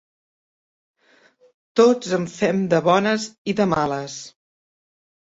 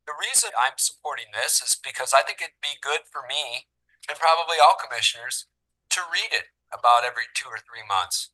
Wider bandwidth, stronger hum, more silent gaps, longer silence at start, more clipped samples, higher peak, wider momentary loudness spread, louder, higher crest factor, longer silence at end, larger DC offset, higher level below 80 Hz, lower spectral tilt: second, 8 kHz vs 12.5 kHz; neither; first, 3.38-3.45 s vs none; first, 1.75 s vs 0.05 s; neither; about the same, -2 dBFS vs -4 dBFS; about the same, 13 LU vs 12 LU; first, -20 LUFS vs -23 LUFS; about the same, 20 dB vs 22 dB; first, 0.95 s vs 0.05 s; neither; first, -60 dBFS vs -74 dBFS; first, -5.5 dB/octave vs 2.5 dB/octave